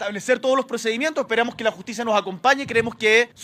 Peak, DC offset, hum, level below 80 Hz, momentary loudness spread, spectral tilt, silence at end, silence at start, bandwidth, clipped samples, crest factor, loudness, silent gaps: -2 dBFS; under 0.1%; none; -62 dBFS; 7 LU; -3 dB/octave; 0 s; 0 s; 15.5 kHz; under 0.1%; 20 dB; -21 LUFS; none